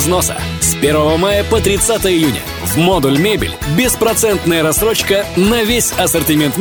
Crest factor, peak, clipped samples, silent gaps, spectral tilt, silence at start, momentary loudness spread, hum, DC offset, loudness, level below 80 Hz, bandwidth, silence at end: 12 dB; -2 dBFS; under 0.1%; none; -4 dB/octave; 0 s; 3 LU; none; under 0.1%; -13 LUFS; -30 dBFS; over 20 kHz; 0 s